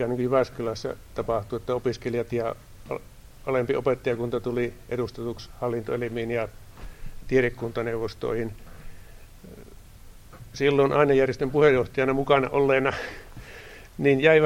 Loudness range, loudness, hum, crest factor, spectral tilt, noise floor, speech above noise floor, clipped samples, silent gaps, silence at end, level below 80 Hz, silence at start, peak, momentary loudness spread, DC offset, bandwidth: 8 LU; -25 LUFS; none; 20 dB; -6.5 dB/octave; -46 dBFS; 22 dB; under 0.1%; none; 0 s; -46 dBFS; 0 s; -4 dBFS; 22 LU; under 0.1%; 16 kHz